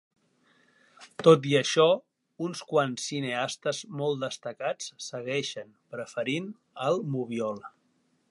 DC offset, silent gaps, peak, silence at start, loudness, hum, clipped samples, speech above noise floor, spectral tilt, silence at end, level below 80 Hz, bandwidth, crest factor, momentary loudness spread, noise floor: under 0.1%; none; -6 dBFS; 1 s; -28 LUFS; none; under 0.1%; 43 dB; -4.5 dB/octave; 0.6 s; -80 dBFS; 11.5 kHz; 24 dB; 15 LU; -71 dBFS